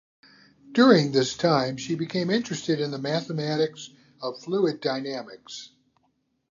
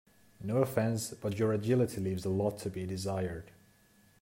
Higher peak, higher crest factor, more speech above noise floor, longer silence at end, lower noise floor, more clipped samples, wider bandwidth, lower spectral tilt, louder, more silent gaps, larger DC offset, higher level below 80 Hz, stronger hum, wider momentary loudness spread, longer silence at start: first, -4 dBFS vs -16 dBFS; about the same, 22 dB vs 18 dB; first, 47 dB vs 33 dB; about the same, 0.85 s vs 0.75 s; first, -72 dBFS vs -65 dBFS; neither; second, 7.6 kHz vs 16 kHz; about the same, -5.5 dB/octave vs -6.5 dB/octave; first, -25 LUFS vs -33 LUFS; neither; neither; about the same, -68 dBFS vs -64 dBFS; neither; first, 20 LU vs 9 LU; first, 0.65 s vs 0.4 s